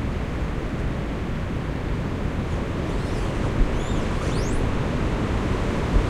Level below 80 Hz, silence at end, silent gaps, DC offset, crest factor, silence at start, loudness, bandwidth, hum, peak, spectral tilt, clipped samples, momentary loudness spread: -28 dBFS; 0 s; none; under 0.1%; 16 dB; 0 s; -26 LUFS; 11.5 kHz; none; -6 dBFS; -6.5 dB/octave; under 0.1%; 3 LU